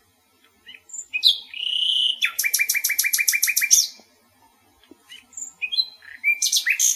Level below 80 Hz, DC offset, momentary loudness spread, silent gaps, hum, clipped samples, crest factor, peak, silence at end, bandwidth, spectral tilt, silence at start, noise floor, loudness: -78 dBFS; under 0.1%; 14 LU; none; none; under 0.1%; 24 dB; 0 dBFS; 0 s; 16 kHz; 6 dB/octave; 0.65 s; -60 dBFS; -19 LUFS